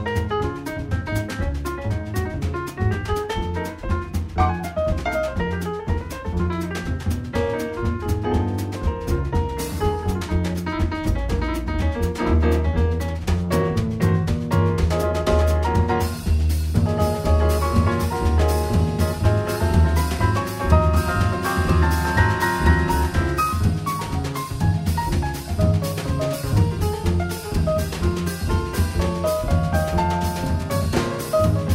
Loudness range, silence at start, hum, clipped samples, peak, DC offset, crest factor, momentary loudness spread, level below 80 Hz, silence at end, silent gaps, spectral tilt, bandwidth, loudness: 5 LU; 0 s; none; under 0.1%; -2 dBFS; under 0.1%; 18 dB; 7 LU; -26 dBFS; 0 s; none; -6.5 dB/octave; 16 kHz; -22 LUFS